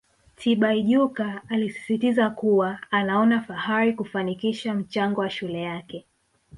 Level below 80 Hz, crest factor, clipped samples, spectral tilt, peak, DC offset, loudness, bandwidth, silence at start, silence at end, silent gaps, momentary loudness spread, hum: -64 dBFS; 16 dB; under 0.1%; -6.5 dB/octave; -8 dBFS; under 0.1%; -24 LUFS; 11.5 kHz; 0.4 s; 0 s; none; 9 LU; none